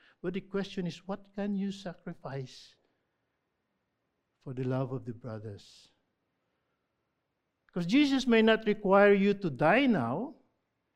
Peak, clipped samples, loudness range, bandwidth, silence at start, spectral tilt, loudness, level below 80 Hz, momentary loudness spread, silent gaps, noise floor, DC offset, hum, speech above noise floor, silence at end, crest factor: -10 dBFS; under 0.1%; 15 LU; 10.5 kHz; 0.25 s; -6.5 dB/octave; -28 LUFS; -64 dBFS; 19 LU; none; -82 dBFS; under 0.1%; none; 53 dB; 0.65 s; 22 dB